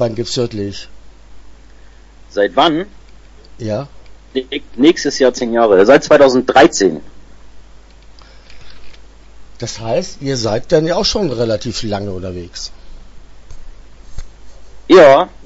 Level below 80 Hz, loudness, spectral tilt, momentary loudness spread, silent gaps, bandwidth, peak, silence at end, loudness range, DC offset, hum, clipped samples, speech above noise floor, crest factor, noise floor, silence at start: -38 dBFS; -13 LUFS; -4.5 dB/octave; 18 LU; none; 8 kHz; 0 dBFS; 0 s; 13 LU; under 0.1%; none; under 0.1%; 26 dB; 16 dB; -39 dBFS; 0 s